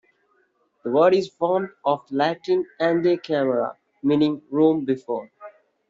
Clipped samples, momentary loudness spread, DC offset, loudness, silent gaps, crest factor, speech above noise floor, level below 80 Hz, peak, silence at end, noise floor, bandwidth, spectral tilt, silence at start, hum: under 0.1%; 8 LU; under 0.1%; -22 LUFS; none; 16 dB; 45 dB; -68 dBFS; -6 dBFS; 0.4 s; -66 dBFS; 7.6 kHz; -5 dB/octave; 0.85 s; none